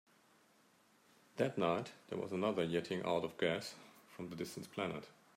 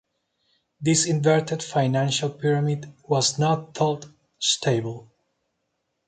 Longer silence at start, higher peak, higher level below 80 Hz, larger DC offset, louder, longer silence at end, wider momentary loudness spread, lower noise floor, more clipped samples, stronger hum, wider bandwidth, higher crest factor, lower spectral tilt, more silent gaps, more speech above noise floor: first, 1.35 s vs 0.8 s; second, -20 dBFS vs -6 dBFS; second, -80 dBFS vs -64 dBFS; neither; second, -40 LUFS vs -23 LUFS; second, 0.25 s vs 1.05 s; first, 13 LU vs 8 LU; second, -70 dBFS vs -76 dBFS; neither; neither; first, 16 kHz vs 9.4 kHz; about the same, 20 dB vs 18 dB; about the same, -5.5 dB/octave vs -4.5 dB/octave; neither; second, 31 dB vs 53 dB